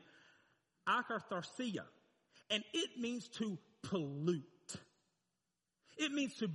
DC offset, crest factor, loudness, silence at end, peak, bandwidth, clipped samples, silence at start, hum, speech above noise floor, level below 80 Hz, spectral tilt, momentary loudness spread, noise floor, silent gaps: under 0.1%; 20 dB; -41 LUFS; 0 s; -22 dBFS; 11 kHz; under 0.1%; 0.85 s; none; 49 dB; -86 dBFS; -4.5 dB/octave; 14 LU; -89 dBFS; none